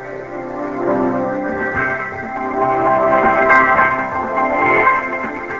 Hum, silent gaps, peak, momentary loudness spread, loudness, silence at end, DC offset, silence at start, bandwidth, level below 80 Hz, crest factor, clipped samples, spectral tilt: none; none; 0 dBFS; 13 LU; -15 LUFS; 0 s; 0.3%; 0 s; 7.6 kHz; -44 dBFS; 16 dB; under 0.1%; -7 dB/octave